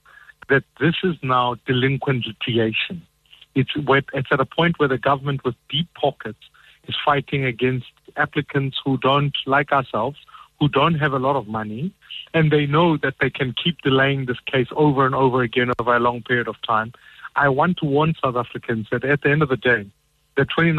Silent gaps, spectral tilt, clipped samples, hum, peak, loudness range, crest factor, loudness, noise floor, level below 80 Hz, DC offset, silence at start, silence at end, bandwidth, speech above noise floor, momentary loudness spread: none; -8 dB/octave; under 0.1%; none; -6 dBFS; 3 LU; 16 dB; -20 LUFS; -46 dBFS; -52 dBFS; under 0.1%; 0.5 s; 0 s; 4.3 kHz; 26 dB; 9 LU